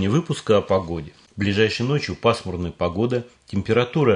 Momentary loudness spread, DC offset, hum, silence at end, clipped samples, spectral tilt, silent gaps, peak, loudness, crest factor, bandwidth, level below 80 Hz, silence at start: 10 LU; under 0.1%; none; 0 s; under 0.1%; -6.5 dB/octave; none; -4 dBFS; -22 LUFS; 18 dB; 10.5 kHz; -52 dBFS; 0 s